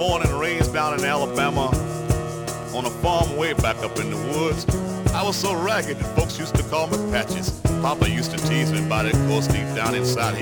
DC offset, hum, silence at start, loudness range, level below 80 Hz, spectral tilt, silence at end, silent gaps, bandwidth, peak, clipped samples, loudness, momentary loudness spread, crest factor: under 0.1%; none; 0 s; 2 LU; -34 dBFS; -5 dB/octave; 0 s; none; over 20 kHz; -4 dBFS; under 0.1%; -22 LUFS; 4 LU; 18 dB